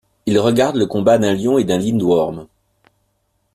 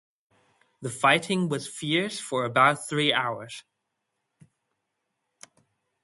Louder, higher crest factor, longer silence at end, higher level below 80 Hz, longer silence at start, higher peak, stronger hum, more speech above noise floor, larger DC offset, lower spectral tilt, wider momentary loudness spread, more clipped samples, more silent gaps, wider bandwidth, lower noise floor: first, -16 LUFS vs -25 LUFS; second, 14 dB vs 24 dB; second, 1.1 s vs 2.45 s; first, -52 dBFS vs -72 dBFS; second, 0.25 s vs 0.8 s; about the same, -2 dBFS vs -4 dBFS; neither; second, 51 dB vs 55 dB; neither; first, -6 dB/octave vs -4 dB/octave; second, 4 LU vs 16 LU; neither; neither; first, 14.5 kHz vs 12 kHz; second, -66 dBFS vs -81 dBFS